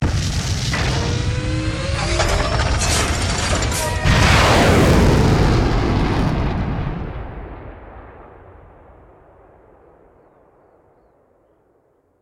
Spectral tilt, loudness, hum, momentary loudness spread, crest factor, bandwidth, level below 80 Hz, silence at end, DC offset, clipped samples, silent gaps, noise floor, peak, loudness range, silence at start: -5 dB/octave; -17 LUFS; none; 18 LU; 16 dB; 17 kHz; -26 dBFS; 3.95 s; under 0.1%; under 0.1%; none; -60 dBFS; -2 dBFS; 14 LU; 0 s